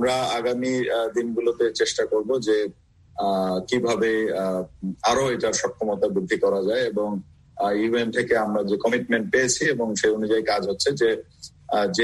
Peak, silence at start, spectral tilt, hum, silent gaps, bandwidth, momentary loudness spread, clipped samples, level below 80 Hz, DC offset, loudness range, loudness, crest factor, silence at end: -8 dBFS; 0 s; -4 dB/octave; none; none; 12.5 kHz; 6 LU; under 0.1%; -58 dBFS; under 0.1%; 2 LU; -23 LUFS; 16 dB; 0 s